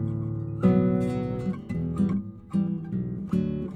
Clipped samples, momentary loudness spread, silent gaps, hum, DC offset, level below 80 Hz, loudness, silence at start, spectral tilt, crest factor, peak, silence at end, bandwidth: under 0.1%; 9 LU; none; none; under 0.1%; -48 dBFS; -27 LUFS; 0 s; -10 dB/octave; 16 dB; -10 dBFS; 0 s; 8.8 kHz